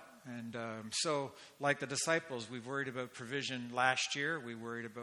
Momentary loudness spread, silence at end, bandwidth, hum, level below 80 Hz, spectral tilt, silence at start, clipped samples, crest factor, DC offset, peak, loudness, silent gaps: 11 LU; 0 s; 17 kHz; none; -82 dBFS; -3 dB/octave; 0 s; under 0.1%; 24 dB; under 0.1%; -16 dBFS; -37 LUFS; none